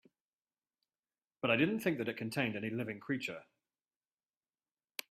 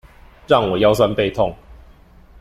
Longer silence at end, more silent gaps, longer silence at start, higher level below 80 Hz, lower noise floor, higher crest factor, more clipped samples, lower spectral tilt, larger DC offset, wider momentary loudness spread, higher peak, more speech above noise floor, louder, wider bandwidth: first, 1.7 s vs 0.65 s; neither; first, 1.45 s vs 0.5 s; second, -78 dBFS vs -42 dBFS; first, under -90 dBFS vs -46 dBFS; first, 24 dB vs 18 dB; neither; about the same, -5.5 dB/octave vs -6 dB/octave; neither; first, 14 LU vs 7 LU; second, -16 dBFS vs -2 dBFS; first, over 54 dB vs 30 dB; second, -36 LUFS vs -17 LUFS; about the same, 15.5 kHz vs 15 kHz